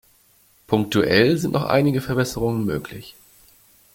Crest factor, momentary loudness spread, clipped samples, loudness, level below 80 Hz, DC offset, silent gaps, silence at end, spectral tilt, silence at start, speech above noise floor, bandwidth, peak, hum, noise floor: 20 dB; 11 LU; under 0.1%; -20 LUFS; -48 dBFS; under 0.1%; none; 0.85 s; -6 dB/octave; 0.7 s; 37 dB; 17 kHz; -2 dBFS; none; -57 dBFS